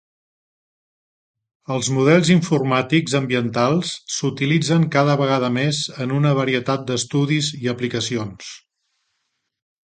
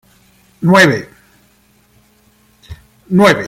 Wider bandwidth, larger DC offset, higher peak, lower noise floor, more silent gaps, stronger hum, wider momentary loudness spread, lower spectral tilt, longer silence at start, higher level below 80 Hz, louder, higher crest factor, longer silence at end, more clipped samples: second, 9.4 kHz vs 16 kHz; neither; about the same, 0 dBFS vs 0 dBFS; first, -74 dBFS vs -52 dBFS; neither; neither; second, 8 LU vs 11 LU; about the same, -5 dB/octave vs -5.5 dB/octave; first, 1.7 s vs 0.6 s; second, -60 dBFS vs -48 dBFS; second, -19 LUFS vs -11 LUFS; about the same, 20 dB vs 16 dB; first, 1.3 s vs 0 s; neither